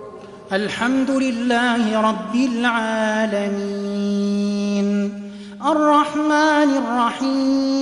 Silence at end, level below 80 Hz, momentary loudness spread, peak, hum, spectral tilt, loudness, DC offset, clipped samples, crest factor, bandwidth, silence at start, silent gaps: 0 s; -60 dBFS; 9 LU; -4 dBFS; none; -5 dB/octave; -19 LUFS; under 0.1%; under 0.1%; 14 dB; 11 kHz; 0 s; none